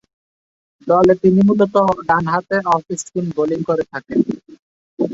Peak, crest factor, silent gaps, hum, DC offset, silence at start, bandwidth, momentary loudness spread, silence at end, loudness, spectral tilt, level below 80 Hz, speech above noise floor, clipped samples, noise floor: 0 dBFS; 16 dB; 4.59-4.97 s; none; under 0.1%; 0.85 s; 8 kHz; 10 LU; 0 s; -17 LUFS; -7 dB/octave; -52 dBFS; over 75 dB; under 0.1%; under -90 dBFS